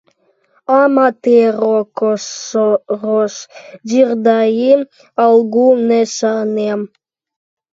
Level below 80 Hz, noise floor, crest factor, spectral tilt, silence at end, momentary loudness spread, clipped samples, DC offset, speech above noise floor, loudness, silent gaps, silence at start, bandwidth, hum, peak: -70 dBFS; -58 dBFS; 14 dB; -5 dB/octave; 0.9 s; 11 LU; under 0.1%; under 0.1%; 45 dB; -14 LUFS; none; 0.7 s; 7.8 kHz; none; 0 dBFS